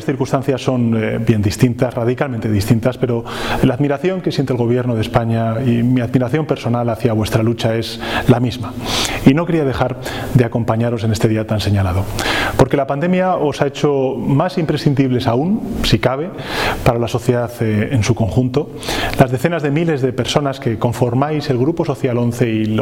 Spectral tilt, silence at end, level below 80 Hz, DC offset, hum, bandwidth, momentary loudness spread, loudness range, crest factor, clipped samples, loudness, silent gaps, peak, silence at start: -6.5 dB/octave; 0 s; -36 dBFS; under 0.1%; none; 16.5 kHz; 4 LU; 1 LU; 16 dB; under 0.1%; -17 LUFS; none; 0 dBFS; 0 s